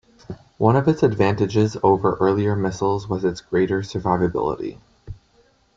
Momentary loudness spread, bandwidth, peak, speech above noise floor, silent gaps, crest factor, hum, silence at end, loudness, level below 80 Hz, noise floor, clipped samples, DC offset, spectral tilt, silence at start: 10 LU; 7.6 kHz; -2 dBFS; 39 dB; none; 20 dB; none; 0.65 s; -20 LUFS; -48 dBFS; -59 dBFS; under 0.1%; under 0.1%; -7.5 dB/octave; 0.3 s